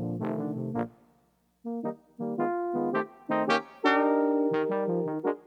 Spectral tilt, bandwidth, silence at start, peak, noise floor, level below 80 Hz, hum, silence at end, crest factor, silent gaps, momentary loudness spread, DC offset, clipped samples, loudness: -7 dB/octave; 8.8 kHz; 0 s; -8 dBFS; -68 dBFS; -74 dBFS; none; 0.05 s; 22 dB; none; 12 LU; under 0.1%; under 0.1%; -29 LUFS